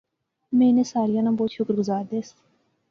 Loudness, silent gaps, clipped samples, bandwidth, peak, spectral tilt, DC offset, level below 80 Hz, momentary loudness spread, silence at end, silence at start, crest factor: -23 LUFS; none; under 0.1%; 7.4 kHz; -10 dBFS; -7 dB/octave; under 0.1%; -68 dBFS; 12 LU; 0.6 s; 0.5 s; 14 dB